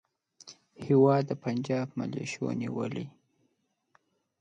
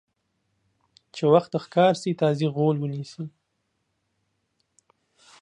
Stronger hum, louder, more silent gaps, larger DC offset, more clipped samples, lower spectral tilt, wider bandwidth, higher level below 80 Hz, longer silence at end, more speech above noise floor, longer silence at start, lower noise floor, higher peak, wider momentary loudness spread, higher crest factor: neither; second, -29 LUFS vs -23 LUFS; neither; neither; neither; about the same, -7.5 dB/octave vs -7 dB/octave; second, 9 kHz vs 11 kHz; about the same, -72 dBFS vs -74 dBFS; second, 1.3 s vs 2.15 s; second, 48 dB vs 53 dB; second, 0.45 s vs 1.15 s; about the same, -76 dBFS vs -75 dBFS; second, -10 dBFS vs -4 dBFS; first, 23 LU vs 17 LU; about the same, 20 dB vs 22 dB